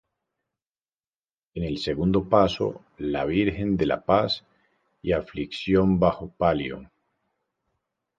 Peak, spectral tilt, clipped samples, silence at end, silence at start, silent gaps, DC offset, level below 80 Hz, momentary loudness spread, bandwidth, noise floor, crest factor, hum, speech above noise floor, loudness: -4 dBFS; -7.5 dB/octave; under 0.1%; 1.35 s; 1.55 s; none; under 0.1%; -46 dBFS; 12 LU; 7.6 kHz; under -90 dBFS; 22 dB; none; over 66 dB; -25 LUFS